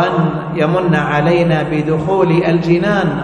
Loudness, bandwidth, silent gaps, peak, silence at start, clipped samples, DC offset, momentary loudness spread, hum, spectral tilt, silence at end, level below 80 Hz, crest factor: -14 LUFS; 8.4 kHz; none; 0 dBFS; 0 s; under 0.1%; under 0.1%; 4 LU; none; -8 dB/octave; 0 s; -42 dBFS; 14 dB